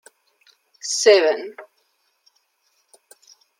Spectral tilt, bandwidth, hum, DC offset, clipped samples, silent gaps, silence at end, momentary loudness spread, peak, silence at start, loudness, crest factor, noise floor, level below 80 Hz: 0.5 dB/octave; 16 kHz; none; under 0.1%; under 0.1%; none; 1.95 s; 19 LU; -2 dBFS; 0.85 s; -18 LUFS; 22 dB; -67 dBFS; -82 dBFS